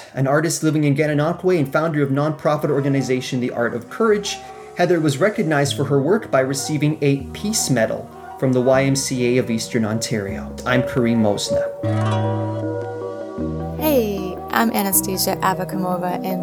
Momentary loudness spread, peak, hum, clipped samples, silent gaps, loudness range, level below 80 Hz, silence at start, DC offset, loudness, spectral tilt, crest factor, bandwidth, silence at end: 8 LU; -2 dBFS; none; under 0.1%; none; 2 LU; -46 dBFS; 0 s; under 0.1%; -20 LUFS; -5 dB/octave; 18 dB; 19 kHz; 0 s